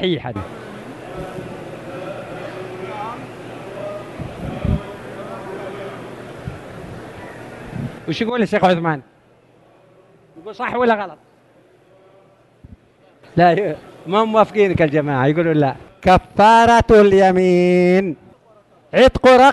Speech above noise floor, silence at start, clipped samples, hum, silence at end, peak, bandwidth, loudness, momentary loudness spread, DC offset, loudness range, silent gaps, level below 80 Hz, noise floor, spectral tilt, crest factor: 38 dB; 0 s; under 0.1%; none; 0 s; 0 dBFS; 12 kHz; -15 LUFS; 23 LU; under 0.1%; 17 LU; none; -38 dBFS; -52 dBFS; -6.5 dB/octave; 18 dB